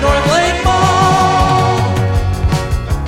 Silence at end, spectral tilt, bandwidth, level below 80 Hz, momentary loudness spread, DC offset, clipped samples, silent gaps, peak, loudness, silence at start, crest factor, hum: 0 s; -5 dB/octave; 16 kHz; -22 dBFS; 5 LU; under 0.1%; under 0.1%; none; 0 dBFS; -13 LUFS; 0 s; 12 dB; none